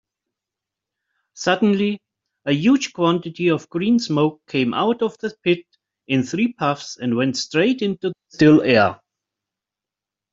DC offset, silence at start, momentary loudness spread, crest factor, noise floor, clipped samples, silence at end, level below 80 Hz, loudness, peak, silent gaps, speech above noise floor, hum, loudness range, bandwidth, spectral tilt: under 0.1%; 1.35 s; 8 LU; 20 dB; -88 dBFS; under 0.1%; 1.4 s; -60 dBFS; -20 LUFS; -2 dBFS; none; 69 dB; none; 3 LU; 7.8 kHz; -5.5 dB/octave